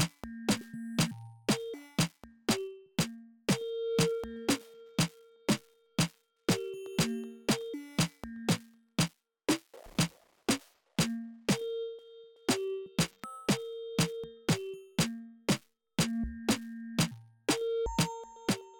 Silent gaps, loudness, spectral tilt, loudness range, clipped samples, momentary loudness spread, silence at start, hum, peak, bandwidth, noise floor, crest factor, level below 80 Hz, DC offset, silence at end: none; -34 LUFS; -4.5 dB/octave; 1 LU; under 0.1%; 6 LU; 0 s; none; -18 dBFS; 18 kHz; -54 dBFS; 16 dB; -56 dBFS; under 0.1%; 0 s